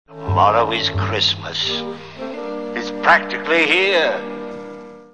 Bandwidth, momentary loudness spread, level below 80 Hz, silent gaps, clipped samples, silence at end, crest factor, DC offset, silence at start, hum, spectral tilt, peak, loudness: 9.6 kHz; 17 LU; -50 dBFS; none; under 0.1%; 0.05 s; 18 dB; 0.4%; 0.1 s; none; -4.5 dB/octave; -2 dBFS; -17 LUFS